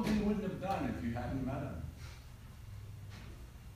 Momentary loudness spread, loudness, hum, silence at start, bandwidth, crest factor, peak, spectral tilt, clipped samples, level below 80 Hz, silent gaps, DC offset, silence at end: 17 LU; -39 LUFS; none; 0 s; 15.5 kHz; 16 dB; -22 dBFS; -7 dB/octave; under 0.1%; -50 dBFS; none; under 0.1%; 0 s